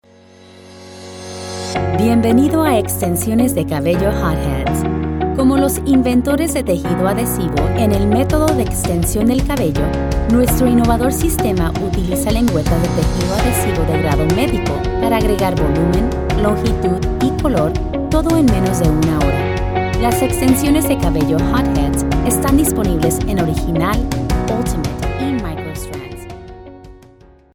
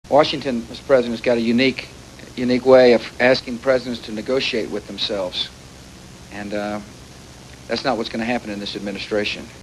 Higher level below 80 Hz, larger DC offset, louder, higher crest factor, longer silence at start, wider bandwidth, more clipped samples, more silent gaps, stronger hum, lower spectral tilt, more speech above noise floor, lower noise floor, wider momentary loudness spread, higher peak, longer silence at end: first, -24 dBFS vs -48 dBFS; neither; first, -16 LUFS vs -20 LUFS; second, 14 dB vs 20 dB; first, 0.55 s vs 0.05 s; first, over 20 kHz vs 12 kHz; neither; neither; neither; about the same, -6 dB/octave vs -5 dB/octave; first, 30 dB vs 21 dB; first, -45 dBFS vs -41 dBFS; second, 7 LU vs 23 LU; about the same, 0 dBFS vs 0 dBFS; first, 0.55 s vs 0 s